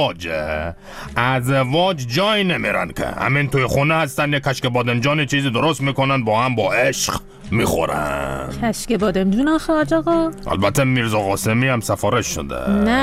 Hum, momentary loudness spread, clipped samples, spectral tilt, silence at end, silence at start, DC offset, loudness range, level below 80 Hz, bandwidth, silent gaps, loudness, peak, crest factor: none; 6 LU; under 0.1%; -5 dB/octave; 0 s; 0 s; under 0.1%; 2 LU; -38 dBFS; 16 kHz; none; -19 LUFS; -2 dBFS; 16 dB